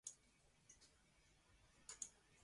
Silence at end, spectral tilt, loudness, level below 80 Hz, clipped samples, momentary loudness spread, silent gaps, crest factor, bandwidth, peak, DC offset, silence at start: 0 s; 0 dB/octave; -57 LUFS; -82 dBFS; under 0.1%; 15 LU; none; 30 dB; 11.5 kHz; -34 dBFS; under 0.1%; 0.05 s